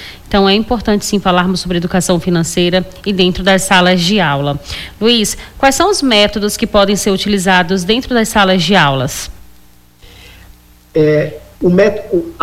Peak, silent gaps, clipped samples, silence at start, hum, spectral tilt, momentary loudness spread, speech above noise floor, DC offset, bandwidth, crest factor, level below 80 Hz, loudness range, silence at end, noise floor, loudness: 0 dBFS; none; under 0.1%; 0 s; 60 Hz at -40 dBFS; -4 dB/octave; 8 LU; 33 dB; under 0.1%; 16 kHz; 12 dB; -34 dBFS; 4 LU; 0 s; -45 dBFS; -12 LUFS